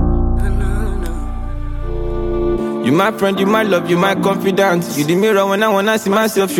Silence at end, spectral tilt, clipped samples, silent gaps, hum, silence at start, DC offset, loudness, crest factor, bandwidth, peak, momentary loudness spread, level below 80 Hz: 0 s; -5.5 dB/octave; under 0.1%; none; none; 0 s; under 0.1%; -16 LUFS; 14 dB; 17 kHz; 0 dBFS; 11 LU; -22 dBFS